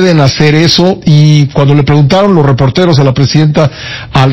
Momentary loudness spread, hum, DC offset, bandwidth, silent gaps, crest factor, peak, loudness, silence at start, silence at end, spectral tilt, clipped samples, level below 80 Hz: 4 LU; none; under 0.1%; 8 kHz; none; 6 dB; 0 dBFS; -7 LUFS; 0 s; 0 s; -6.5 dB/octave; 9%; -32 dBFS